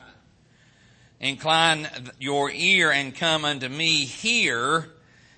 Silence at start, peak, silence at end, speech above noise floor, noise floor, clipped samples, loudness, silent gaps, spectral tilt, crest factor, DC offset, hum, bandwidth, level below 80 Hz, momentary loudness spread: 1.2 s; -4 dBFS; 0.5 s; 34 dB; -58 dBFS; under 0.1%; -22 LUFS; none; -2.5 dB/octave; 22 dB; under 0.1%; none; 8.8 kHz; -64 dBFS; 10 LU